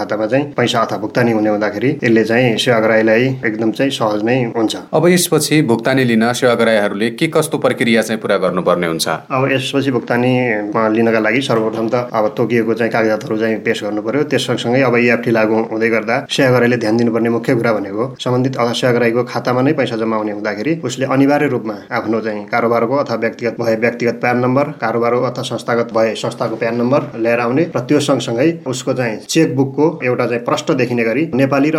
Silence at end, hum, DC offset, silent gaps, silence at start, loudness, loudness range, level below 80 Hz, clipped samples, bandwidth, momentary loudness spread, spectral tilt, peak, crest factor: 0 s; none; under 0.1%; none; 0 s; -15 LUFS; 3 LU; -62 dBFS; under 0.1%; 16.5 kHz; 6 LU; -5.5 dB/octave; -2 dBFS; 14 dB